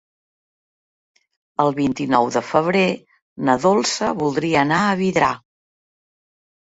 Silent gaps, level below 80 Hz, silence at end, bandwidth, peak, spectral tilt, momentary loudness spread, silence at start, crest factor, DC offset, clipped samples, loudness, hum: 3.22-3.36 s; -56 dBFS; 1.25 s; 8 kHz; -2 dBFS; -5 dB/octave; 5 LU; 1.6 s; 20 dB; under 0.1%; under 0.1%; -19 LUFS; none